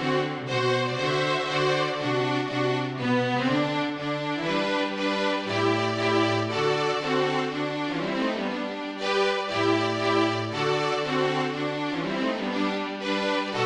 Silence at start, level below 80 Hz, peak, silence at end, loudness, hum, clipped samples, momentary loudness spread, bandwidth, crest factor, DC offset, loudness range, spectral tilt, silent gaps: 0 s; -64 dBFS; -10 dBFS; 0 s; -26 LUFS; none; under 0.1%; 5 LU; 10.5 kHz; 14 dB; under 0.1%; 1 LU; -5 dB/octave; none